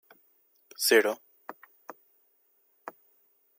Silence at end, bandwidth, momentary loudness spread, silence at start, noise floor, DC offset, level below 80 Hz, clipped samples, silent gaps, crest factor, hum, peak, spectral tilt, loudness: 0.7 s; 16.5 kHz; 27 LU; 0.8 s; -69 dBFS; under 0.1%; under -90 dBFS; under 0.1%; none; 24 dB; none; -8 dBFS; -0.5 dB/octave; -25 LUFS